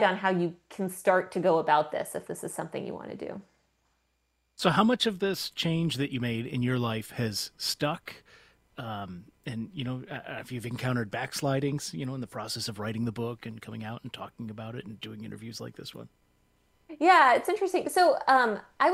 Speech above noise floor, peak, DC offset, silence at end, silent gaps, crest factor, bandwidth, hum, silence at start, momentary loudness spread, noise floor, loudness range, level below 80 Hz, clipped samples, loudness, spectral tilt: 46 dB; -8 dBFS; under 0.1%; 0 s; none; 22 dB; 16 kHz; none; 0 s; 17 LU; -75 dBFS; 10 LU; -66 dBFS; under 0.1%; -28 LUFS; -5 dB/octave